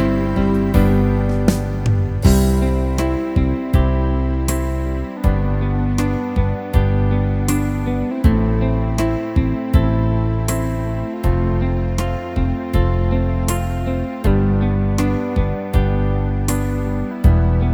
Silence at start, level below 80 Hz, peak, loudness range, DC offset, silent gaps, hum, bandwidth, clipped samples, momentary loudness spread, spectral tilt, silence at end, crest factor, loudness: 0 s; -22 dBFS; 0 dBFS; 3 LU; under 0.1%; none; none; 20 kHz; under 0.1%; 6 LU; -7.5 dB/octave; 0 s; 16 dB; -19 LUFS